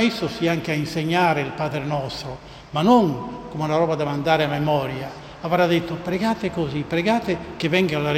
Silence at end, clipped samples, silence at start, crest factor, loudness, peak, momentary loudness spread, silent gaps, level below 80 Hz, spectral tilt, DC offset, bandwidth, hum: 0 s; under 0.1%; 0 s; 18 dB; -22 LUFS; -4 dBFS; 11 LU; none; -50 dBFS; -6.5 dB/octave; under 0.1%; 15.5 kHz; none